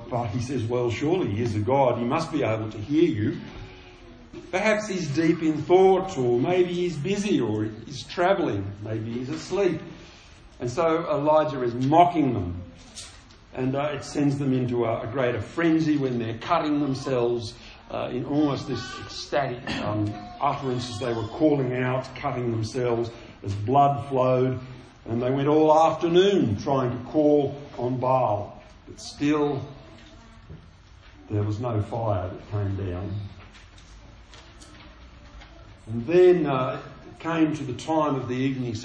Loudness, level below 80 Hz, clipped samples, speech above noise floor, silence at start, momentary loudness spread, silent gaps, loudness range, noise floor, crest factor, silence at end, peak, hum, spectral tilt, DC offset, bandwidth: -25 LUFS; -52 dBFS; under 0.1%; 25 dB; 0 s; 14 LU; none; 8 LU; -49 dBFS; 22 dB; 0 s; -2 dBFS; none; -7 dB/octave; under 0.1%; 9.6 kHz